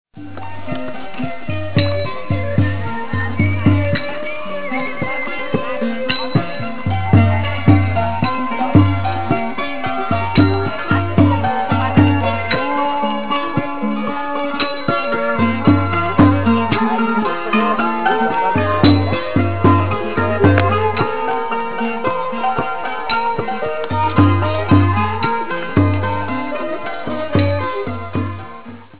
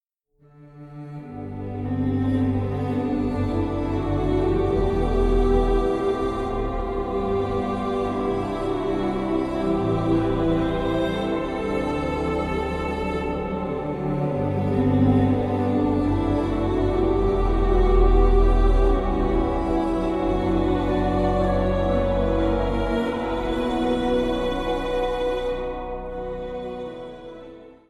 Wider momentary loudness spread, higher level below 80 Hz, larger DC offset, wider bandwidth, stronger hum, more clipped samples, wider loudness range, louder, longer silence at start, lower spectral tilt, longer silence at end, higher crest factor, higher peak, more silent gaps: about the same, 10 LU vs 10 LU; about the same, -32 dBFS vs -28 dBFS; first, 4% vs under 0.1%; second, 4 kHz vs 9.2 kHz; neither; neither; about the same, 4 LU vs 4 LU; first, -17 LUFS vs -23 LUFS; second, 0.05 s vs 0.6 s; first, -11 dB/octave vs -8.5 dB/octave; second, 0 s vs 0.15 s; about the same, 16 dB vs 16 dB; first, 0 dBFS vs -6 dBFS; neither